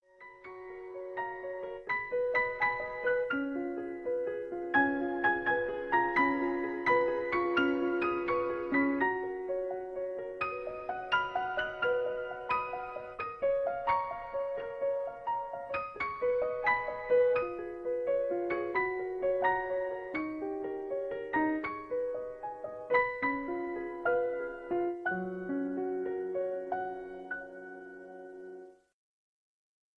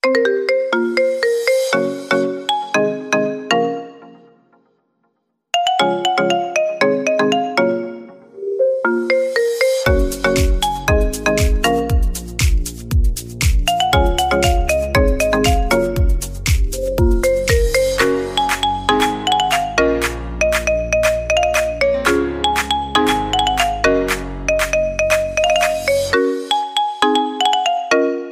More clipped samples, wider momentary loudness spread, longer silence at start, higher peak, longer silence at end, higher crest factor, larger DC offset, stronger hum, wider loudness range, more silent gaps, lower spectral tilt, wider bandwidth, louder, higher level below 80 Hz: neither; first, 12 LU vs 4 LU; first, 0.2 s vs 0.05 s; second, -16 dBFS vs -2 dBFS; first, 1.25 s vs 0 s; about the same, 18 dB vs 16 dB; neither; neither; first, 6 LU vs 3 LU; neither; first, -7 dB/octave vs -4.5 dB/octave; second, 6.2 kHz vs 16 kHz; second, -33 LUFS vs -17 LUFS; second, -64 dBFS vs -24 dBFS